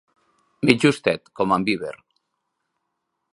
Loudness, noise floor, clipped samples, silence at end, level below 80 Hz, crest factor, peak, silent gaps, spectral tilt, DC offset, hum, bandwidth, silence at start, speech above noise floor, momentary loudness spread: -21 LUFS; -77 dBFS; under 0.1%; 1.4 s; -60 dBFS; 24 dB; 0 dBFS; none; -5.5 dB/octave; under 0.1%; none; 11.5 kHz; 0.6 s; 57 dB; 9 LU